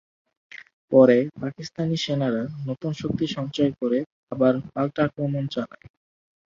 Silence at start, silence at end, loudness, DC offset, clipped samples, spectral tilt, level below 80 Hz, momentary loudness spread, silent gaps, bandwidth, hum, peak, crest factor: 0.55 s; 0.9 s; -24 LUFS; under 0.1%; under 0.1%; -7 dB/octave; -60 dBFS; 16 LU; 0.73-0.88 s, 4.06-4.27 s; 7.6 kHz; none; -4 dBFS; 20 dB